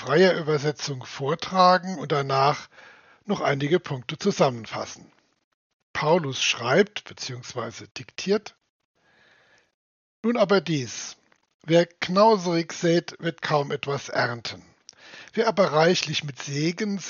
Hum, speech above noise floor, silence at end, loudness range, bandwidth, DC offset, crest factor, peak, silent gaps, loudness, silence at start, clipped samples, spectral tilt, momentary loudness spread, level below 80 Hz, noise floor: none; 36 dB; 0 s; 5 LU; 7.2 kHz; under 0.1%; 20 dB; -4 dBFS; 5.44-5.94 s, 7.91-7.95 s, 8.70-8.94 s, 9.74-10.23 s, 11.54-11.59 s; -24 LUFS; 0 s; under 0.1%; -4 dB/octave; 15 LU; -70 dBFS; -60 dBFS